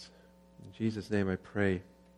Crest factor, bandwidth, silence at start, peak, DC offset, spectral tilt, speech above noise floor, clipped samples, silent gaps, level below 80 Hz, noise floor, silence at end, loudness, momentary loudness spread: 20 dB; 12 kHz; 0 s; -14 dBFS; under 0.1%; -7.5 dB/octave; 27 dB; under 0.1%; none; -64 dBFS; -60 dBFS; 0.35 s; -34 LUFS; 21 LU